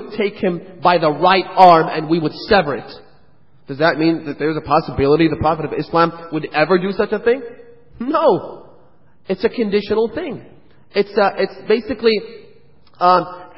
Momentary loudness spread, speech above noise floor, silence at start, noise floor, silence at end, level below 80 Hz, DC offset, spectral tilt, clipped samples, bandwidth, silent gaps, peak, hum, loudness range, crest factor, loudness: 11 LU; 38 dB; 0 s; -54 dBFS; 0.1 s; -46 dBFS; 0.6%; -8.5 dB/octave; under 0.1%; 8 kHz; none; 0 dBFS; none; 5 LU; 18 dB; -17 LUFS